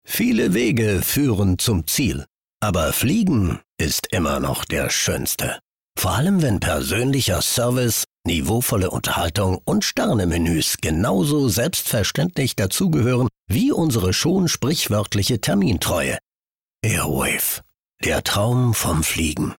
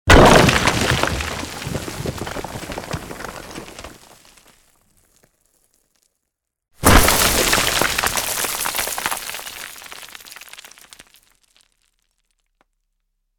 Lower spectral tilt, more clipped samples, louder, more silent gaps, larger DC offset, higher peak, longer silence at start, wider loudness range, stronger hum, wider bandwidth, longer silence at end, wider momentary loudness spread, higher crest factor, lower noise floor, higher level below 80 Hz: about the same, -4.5 dB/octave vs -3.5 dB/octave; neither; second, -20 LUFS vs -17 LUFS; first, 2.29-2.60 s, 3.66-3.77 s, 5.62-5.95 s, 8.07-8.23 s, 13.39-13.47 s, 16.23-16.79 s, 17.74-17.84 s vs none; neither; second, -10 dBFS vs 0 dBFS; about the same, 0.1 s vs 0.05 s; second, 2 LU vs 20 LU; neither; about the same, 19.5 kHz vs over 20 kHz; second, 0.05 s vs 2.8 s; second, 4 LU vs 24 LU; second, 10 dB vs 20 dB; first, under -90 dBFS vs -78 dBFS; second, -40 dBFS vs -30 dBFS